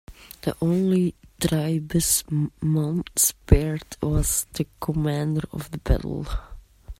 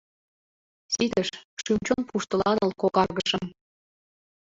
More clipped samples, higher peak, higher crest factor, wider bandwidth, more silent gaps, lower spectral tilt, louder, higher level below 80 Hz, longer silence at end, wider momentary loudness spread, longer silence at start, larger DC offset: neither; first, -2 dBFS vs -8 dBFS; about the same, 22 dB vs 20 dB; first, 16 kHz vs 8 kHz; second, none vs 1.45-1.57 s; about the same, -5 dB/octave vs -4 dB/octave; about the same, -24 LUFS vs -26 LUFS; first, -32 dBFS vs -56 dBFS; second, 0.05 s vs 1 s; first, 11 LU vs 8 LU; second, 0.1 s vs 0.9 s; neither